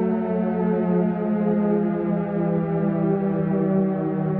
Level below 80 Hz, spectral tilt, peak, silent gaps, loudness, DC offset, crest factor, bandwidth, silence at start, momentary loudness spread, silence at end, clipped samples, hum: -56 dBFS; -10.5 dB/octave; -10 dBFS; none; -22 LUFS; under 0.1%; 12 dB; 3.6 kHz; 0 s; 2 LU; 0 s; under 0.1%; none